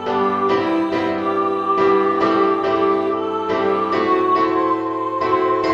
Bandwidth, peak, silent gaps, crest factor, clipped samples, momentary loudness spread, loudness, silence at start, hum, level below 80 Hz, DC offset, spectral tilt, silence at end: 7.4 kHz; -4 dBFS; none; 14 dB; under 0.1%; 5 LU; -18 LUFS; 0 s; none; -56 dBFS; under 0.1%; -6.5 dB/octave; 0 s